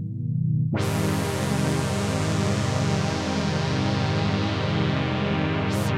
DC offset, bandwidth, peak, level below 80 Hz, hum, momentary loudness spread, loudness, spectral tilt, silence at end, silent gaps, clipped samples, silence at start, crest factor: under 0.1%; 15.5 kHz; -12 dBFS; -46 dBFS; none; 1 LU; -24 LUFS; -6 dB/octave; 0 s; none; under 0.1%; 0 s; 12 dB